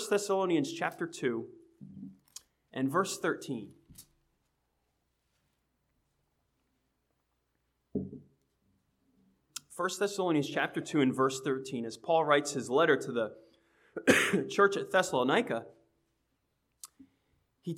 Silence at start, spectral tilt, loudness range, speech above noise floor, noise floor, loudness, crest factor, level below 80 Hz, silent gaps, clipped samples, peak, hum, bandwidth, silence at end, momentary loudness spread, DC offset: 0 s; -4.5 dB/octave; 20 LU; 49 dB; -79 dBFS; -31 LUFS; 26 dB; -76 dBFS; none; under 0.1%; -8 dBFS; none; 16.5 kHz; 0 s; 22 LU; under 0.1%